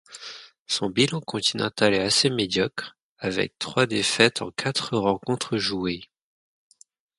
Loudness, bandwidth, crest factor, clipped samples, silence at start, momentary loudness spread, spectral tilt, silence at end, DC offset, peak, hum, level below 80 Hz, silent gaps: -23 LUFS; 11.5 kHz; 24 dB; under 0.1%; 0.1 s; 16 LU; -3.5 dB/octave; 1.15 s; under 0.1%; 0 dBFS; none; -58 dBFS; 0.60-0.66 s, 3.01-3.16 s